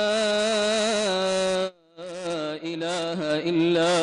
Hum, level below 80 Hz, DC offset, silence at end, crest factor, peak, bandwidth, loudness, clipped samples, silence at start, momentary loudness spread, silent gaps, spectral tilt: none; -62 dBFS; under 0.1%; 0 s; 12 dB; -14 dBFS; 11 kHz; -24 LUFS; under 0.1%; 0 s; 10 LU; none; -3.5 dB/octave